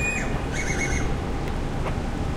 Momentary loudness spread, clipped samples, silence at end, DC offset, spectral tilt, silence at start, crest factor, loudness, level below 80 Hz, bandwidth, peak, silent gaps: 4 LU; under 0.1%; 0 s; under 0.1%; -5 dB/octave; 0 s; 12 dB; -27 LUFS; -30 dBFS; 13.5 kHz; -12 dBFS; none